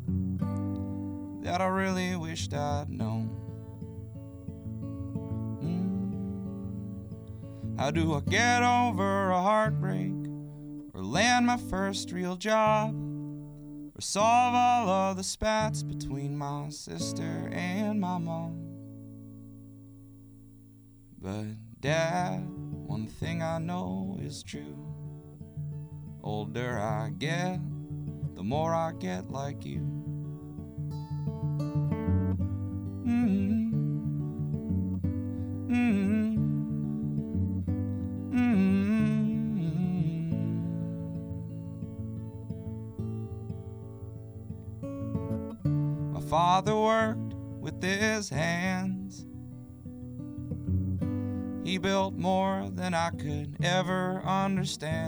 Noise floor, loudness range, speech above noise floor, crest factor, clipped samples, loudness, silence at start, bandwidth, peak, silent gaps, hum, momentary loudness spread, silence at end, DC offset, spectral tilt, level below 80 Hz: -54 dBFS; 9 LU; 25 dB; 20 dB; under 0.1%; -31 LUFS; 0 s; over 20 kHz; -12 dBFS; none; none; 17 LU; 0 s; under 0.1%; -6 dB/octave; -54 dBFS